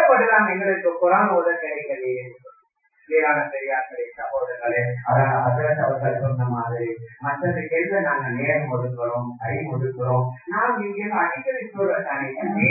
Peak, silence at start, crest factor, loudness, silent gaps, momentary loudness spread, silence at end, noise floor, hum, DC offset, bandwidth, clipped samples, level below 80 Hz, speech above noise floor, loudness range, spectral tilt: -4 dBFS; 0 s; 18 dB; -22 LUFS; none; 10 LU; 0 s; -61 dBFS; none; under 0.1%; 2.7 kHz; under 0.1%; -62 dBFS; 39 dB; 3 LU; -15 dB/octave